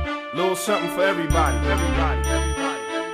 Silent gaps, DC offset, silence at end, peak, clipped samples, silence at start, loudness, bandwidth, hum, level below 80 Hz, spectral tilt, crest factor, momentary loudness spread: none; under 0.1%; 0 s; -6 dBFS; under 0.1%; 0 s; -22 LUFS; 15.5 kHz; none; -28 dBFS; -5 dB/octave; 16 dB; 5 LU